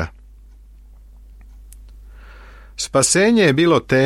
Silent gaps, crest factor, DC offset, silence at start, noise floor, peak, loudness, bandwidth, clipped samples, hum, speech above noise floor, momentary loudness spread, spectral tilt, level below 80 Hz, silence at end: none; 18 dB; under 0.1%; 0 s; -43 dBFS; -2 dBFS; -15 LUFS; 15.5 kHz; under 0.1%; none; 29 dB; 16 LU; -4 dB/octave; -42 dBFS; 0 s